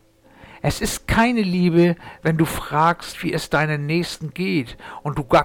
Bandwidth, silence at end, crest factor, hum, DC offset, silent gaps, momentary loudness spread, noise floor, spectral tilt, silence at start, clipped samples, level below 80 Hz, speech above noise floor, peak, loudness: 18 kHz; 0 s; 14 dB; none; under 0.1%; none; 9 LU; -48 dBFS; -5.5 dB/octave; 0.5 s; under 0.1%; -38 dBFS; 28 dB; -6 dBFS; -21 LUFS